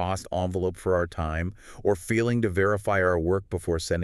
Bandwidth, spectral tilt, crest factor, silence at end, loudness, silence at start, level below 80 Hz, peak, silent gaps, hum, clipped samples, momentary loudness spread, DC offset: 13.5 kHz; -6 dB/octave; 16 dB; 0 s; -26 LUFS; 0 s; -42 dBFS; -10 dBFS; none; none; under 0.1%; 6 LU; under 0.1%